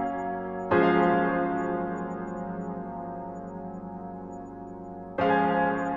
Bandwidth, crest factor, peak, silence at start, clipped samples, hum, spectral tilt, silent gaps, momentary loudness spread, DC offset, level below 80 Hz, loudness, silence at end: 7.4 kHz; 18 dB; -10 dBFS; 0 s; under 0.1%; none; -8 dB/octave; none; 17 LU; under 0.1%; -58 dBFS; -28 LUFS; 0 s